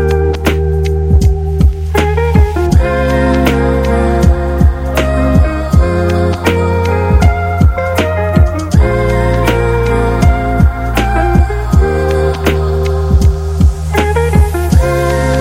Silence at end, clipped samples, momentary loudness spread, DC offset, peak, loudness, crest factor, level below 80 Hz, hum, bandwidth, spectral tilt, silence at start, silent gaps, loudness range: 0 s; under 0.1%; 3 LU; under 0.1%; 0 dBFS; -12 LUFS; 10 dB; -14 dBFS; none; 16 kHz; -7 dB/octave; 0 s; none; 1 LU